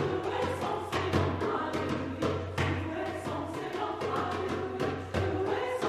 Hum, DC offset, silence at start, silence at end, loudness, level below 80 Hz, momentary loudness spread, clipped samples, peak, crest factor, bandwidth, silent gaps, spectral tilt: none; under 0.1%; 0 s; 0 s; -32 LUFS; -56 dBFS; 5 LU; under 0.1%; -14 dBFS; 18 dB; 14.5 kHz; none; -6 dB/octave